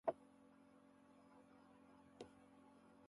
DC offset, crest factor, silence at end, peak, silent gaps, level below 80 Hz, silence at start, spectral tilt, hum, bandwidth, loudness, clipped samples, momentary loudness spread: under 0.1%; 30 dB; 0 s; -26 dBFS; none; -88 dBFS; 0.05 s; -6 dB/octave; none; 11 kHz; -61 LUFS; under 0.1%; 7 LU